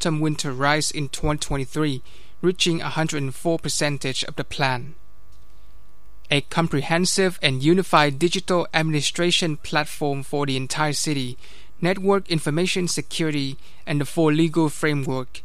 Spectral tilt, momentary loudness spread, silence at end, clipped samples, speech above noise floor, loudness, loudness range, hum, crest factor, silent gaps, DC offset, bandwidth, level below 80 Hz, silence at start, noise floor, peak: -4.5 dB/octave; 7 LU; 0.05 s; under 0.1%; 29 dB; -22 LUFS; 5 LU; none; 22 dB; none; 3%; 15.5 kHz; -44 dBFS; 0 s; -51 dBFS; -2 dBFS